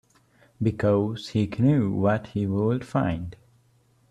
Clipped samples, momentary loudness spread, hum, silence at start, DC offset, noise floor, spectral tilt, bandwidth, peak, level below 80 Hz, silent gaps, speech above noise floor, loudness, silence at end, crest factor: under 0.1%; 7 LU; none; 0.6 s; under 0.1%; -62 dBFS; -8.5 dB/octave; 10 kHz; -10 dBFS; -54 dBFS; none; 39 dB; -25 LUFS; 0.75 s; 16 dB